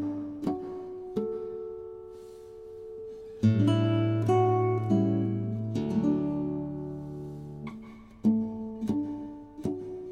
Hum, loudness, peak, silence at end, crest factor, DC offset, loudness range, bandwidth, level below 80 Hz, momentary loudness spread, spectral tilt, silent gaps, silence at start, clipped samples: none; -29 LUFS; -12 dBFS; 0 s; 18 dB; under 0.1%; 7 LU; 9.2 kHz; -58 dBFS; 19 LU; -9 dB/octave; none; 0 s; under 0.1%